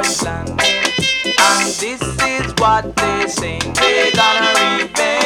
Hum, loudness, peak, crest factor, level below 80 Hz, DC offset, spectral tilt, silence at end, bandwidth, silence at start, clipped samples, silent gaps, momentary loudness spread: none; -14 LUFS; 0 dBFS; 16 dB; -38 dBFS; under 0.1%; -2 dB/octave; 0 s; 18 kHz; 0 s; under 0.1%; none; 8 LU